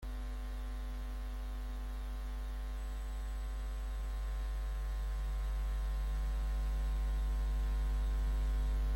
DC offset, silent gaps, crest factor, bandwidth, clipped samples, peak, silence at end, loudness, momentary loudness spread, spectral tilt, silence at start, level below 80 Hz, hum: under 0.1%; none; 8 dB; 16.5 kHz; under 0.1%; -28 dBFS; 0 s; -40 LUFS; 7 LU; -6 dB/octave; 0 s; -36 dBFS; none